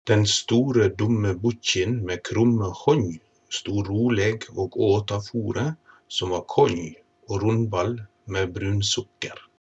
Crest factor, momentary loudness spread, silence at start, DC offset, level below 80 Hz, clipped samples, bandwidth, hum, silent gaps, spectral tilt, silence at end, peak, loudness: 18 dB; 11 LU; 0.05 s; under 0.1%; -58 dBFS; under 0.1%; 8.4 kHz; none; none; -5 dB/octave; 0.2 s; -6 dBFS; -24 LUFS